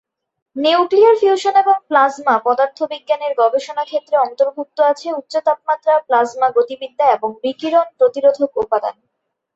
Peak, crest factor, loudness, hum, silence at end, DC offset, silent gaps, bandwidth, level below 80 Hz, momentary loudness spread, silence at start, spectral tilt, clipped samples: -2 dBFS; 14 dB; -16 LUFS; none; 0.65 s; under 0.1%; none; 8 kHz; -66 dBFS; 8 LU; 0.55 s; -3.5 dB/octave; under 0.1%